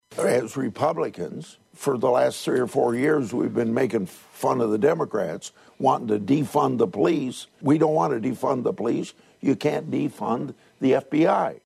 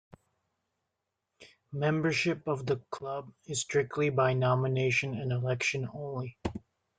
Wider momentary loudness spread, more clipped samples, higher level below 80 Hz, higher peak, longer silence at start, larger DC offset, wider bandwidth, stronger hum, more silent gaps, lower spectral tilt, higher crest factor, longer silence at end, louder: about the same, 9 LU vs 11 LU; neither; second, -68 dBFS vs -62 dBFS; first, -6 dBFS vs -14 dBFS; second, 0.1 s vs 1.4 s; neither; first, 14.5 kHz vs 9.4 kHz; neither; neither; about the same, -6.5 dB/octave vs -5.5 dB/octave; about the same, 18 dB vs 18 dB; second, 0.1 s vs 0.4 s; first, -24 LUFS vs -31 LUFS